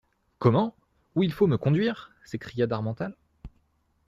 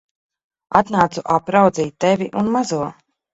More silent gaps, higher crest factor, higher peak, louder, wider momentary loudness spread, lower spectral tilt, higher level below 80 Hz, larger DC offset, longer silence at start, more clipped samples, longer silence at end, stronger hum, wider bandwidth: neither; about the same, 20 dB vs 18 dB; second, -8 dBFS vs 0 dBFS; second, -27 LUFS vs -18 LUFS; first, 14 LU vs 7 LU; first, -8.5 dB/octave vs -6 dB/octave; about the same, -56 dBFS vs -56 dBFS; neither; second, 0.4 s vs 0.7 s; neither; first, 0.6 s vs 0.4 s; neither; first, 13.5 kHz vs 8.2 kHz